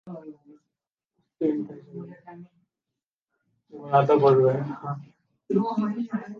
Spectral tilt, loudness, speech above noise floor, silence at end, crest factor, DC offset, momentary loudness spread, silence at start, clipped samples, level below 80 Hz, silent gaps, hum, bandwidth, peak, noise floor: -9.5 dB/octave; -24 LUFS; 63 dB; 0 s; 20 dB; under 0.1%; 23 LU; 0.05 s; under 0.1%; -76 dBFS; 3.06-3.17 s, 3.24-3.28 s; none; 6.6 kHz; -6 dBFS; -88 dBFS